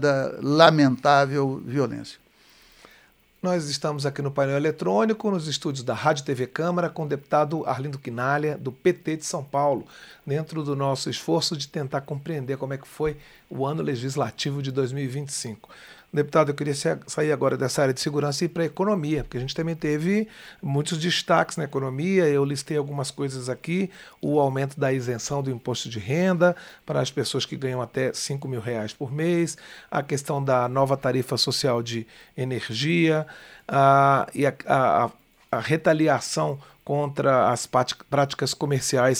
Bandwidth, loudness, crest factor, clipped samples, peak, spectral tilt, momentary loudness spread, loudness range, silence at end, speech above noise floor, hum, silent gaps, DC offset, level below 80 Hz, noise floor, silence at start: 16 kHz; -24 LUFS; 24 dB; under 0.1%; 0 dBFS; -5 dB/octave; 10 LU; 6 LU; 0 s; 33 dB; none; none; under 0.1%; -58 dBFS; -57 dBFS; 0 s